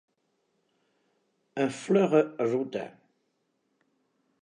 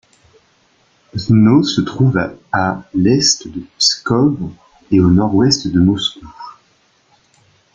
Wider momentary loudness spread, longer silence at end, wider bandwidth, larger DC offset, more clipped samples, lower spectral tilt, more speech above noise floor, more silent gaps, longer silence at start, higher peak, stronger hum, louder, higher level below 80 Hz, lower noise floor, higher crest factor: about the same, 16 LU vs 17 LU; first, 1.55 s vs 1.25 s; first, 10.5 kHz vs 9.4 kHz; neither; neither; first, -6.5 dB/octave vs -5 dB/octave; first, 50 dB vs 42 dB; neither; first, 1.55 s vs 1.15 s; second, -10 dBFS vs 0 dBFS; neither; second, -27 LUFS vs -14 LUFS; second, -82 dBFS vs -44 dBFS; first, -76 dBFS vs -56 dBFS; first, 22 dB vs 16 dB